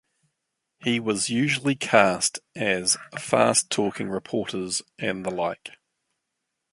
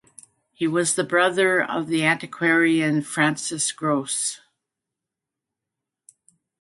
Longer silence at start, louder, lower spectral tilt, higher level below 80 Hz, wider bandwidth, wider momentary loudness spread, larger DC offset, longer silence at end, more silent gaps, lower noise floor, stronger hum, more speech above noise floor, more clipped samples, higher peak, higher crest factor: first, 0.8 s vs 0.6 s; second, -24 LUFS vs -21 LUFS; about the same, -3 dB/octave vs -3.5 dB/octave; first, -64 dBFS vs -72 dBFS; about the same, 11.5 kHz vs 11.5 kHz; first, 10 LU vs 6 LU; neither; second, 1.05 s vs 2.25 s; neither; second, -81 dBFS vs -86 dBFS; neither; second, 56 dB vs 64 dB; neither; about the same, -2 dBFS vs -4 dBFS; about the same, 24 dB vs 20 dB